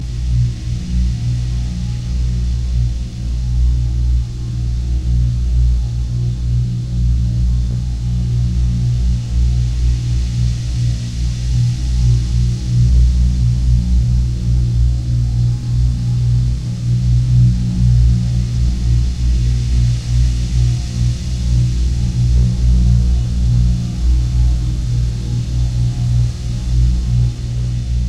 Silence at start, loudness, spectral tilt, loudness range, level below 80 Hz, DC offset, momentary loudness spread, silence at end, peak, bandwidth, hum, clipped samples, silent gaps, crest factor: 0 s; -17 LUFS; -7 dB/octave; 3 LU; -16 dBFS; under 0.1%; 6 LU; 0 s; -2 dBFS; 9.2 kHz; 60 Hz at -25 dBFS; under 0.1%; none; 12 dB